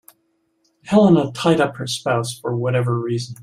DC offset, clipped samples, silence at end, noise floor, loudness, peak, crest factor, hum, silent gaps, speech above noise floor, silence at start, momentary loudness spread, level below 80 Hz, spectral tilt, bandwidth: under 0.1%; under 0.1%; 0 s; -67 dBFS; -19 LUFS; -2 dBFS; 16 dB; none; none; 49 dB; 0.85 s; 10 LU; -58 dBFS; -6 dB/octave; 15 kHz